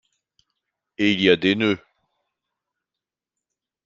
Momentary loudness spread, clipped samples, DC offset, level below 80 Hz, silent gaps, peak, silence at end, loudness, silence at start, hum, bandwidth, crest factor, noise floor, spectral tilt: 6 LU; under 0.1%; under 0.1%; -64 dBFS; none; -2 dBFS; 2.1 s; -20 LUFS; 1 s; none; 7.4 kHz; 24 dB; -88 dBFS; -6 dB/octave